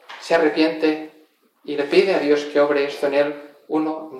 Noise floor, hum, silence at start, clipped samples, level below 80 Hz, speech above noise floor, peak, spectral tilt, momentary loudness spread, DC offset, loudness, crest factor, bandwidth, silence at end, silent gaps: -56 dBFS; none; 0.1 s; under 0.1%; -74 dBFS; 36 dB; -4 dBFS; -5 dB/octave; 11 LU; under 0.1%; -20 LUFS; 18 dB; 12.5 kHz; 0 s; none